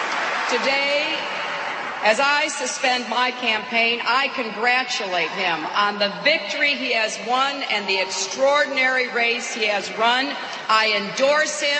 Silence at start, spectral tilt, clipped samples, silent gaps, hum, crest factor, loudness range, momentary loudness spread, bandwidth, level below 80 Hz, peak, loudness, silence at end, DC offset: 0 s; -1 dB/octave; under 0.1%; none; none; 18 dB; 1 LU; 5 LU; 8.8 kHz; -72 dBFS; -4 dBFS; -20 LUFS; 0 s; under 0.1%